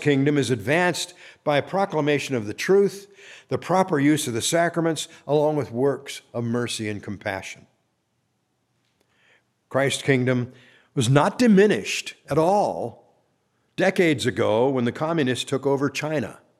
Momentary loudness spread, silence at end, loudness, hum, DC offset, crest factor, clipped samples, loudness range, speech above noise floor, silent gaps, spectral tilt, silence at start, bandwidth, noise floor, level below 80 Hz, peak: 11 LU; 0.25 s; -23 LUFS; none; under 0.1%; 20 dB; under 0.1%; 8 LU; 50 dB; none; -5 dB/octave; 0 s; 14.5 kHz; -72 dBFS; -66 dBFS; -2 dBFS